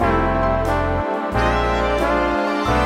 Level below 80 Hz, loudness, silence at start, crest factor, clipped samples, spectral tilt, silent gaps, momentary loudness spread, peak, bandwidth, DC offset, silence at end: -28 dBFS; -19 LUFS; 0 s; 14 dB; under 0.1%; -6.5 dB/octave; none; 3 LU; -4 dBFS; 15.5 kHz; under 0.1%; 0 s